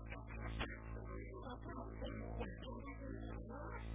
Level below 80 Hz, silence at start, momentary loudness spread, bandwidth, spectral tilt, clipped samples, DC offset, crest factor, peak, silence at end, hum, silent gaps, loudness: -52 dBFS; 0 s; 4 LU; 4 kHz; -5.5 dB/octave; under 0.1%; under 0.1%; 18 dB; -30 dBFS; 0 s; none; none; -49 LUFS